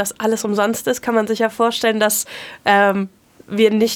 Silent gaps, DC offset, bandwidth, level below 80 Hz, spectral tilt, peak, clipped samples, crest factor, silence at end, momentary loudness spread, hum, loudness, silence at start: none; under 0.1%; 19.5 kHz; -62 dBFS; -3.5 dB/octave; 0 dBFS; under 0.1%; 18 dB; 0 s; 9 LU; none; -17 LUFS; 0 s